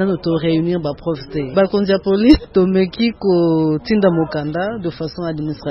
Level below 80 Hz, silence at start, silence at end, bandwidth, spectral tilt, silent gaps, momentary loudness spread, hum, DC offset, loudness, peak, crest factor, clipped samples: -38 dBFS; 0 s; 0 s; 6 kHz; -9 dB/octave; none; 11 LU; none; under 0.1%; -17 LUFS; 0 dBFS; 16 dB; under 0.1%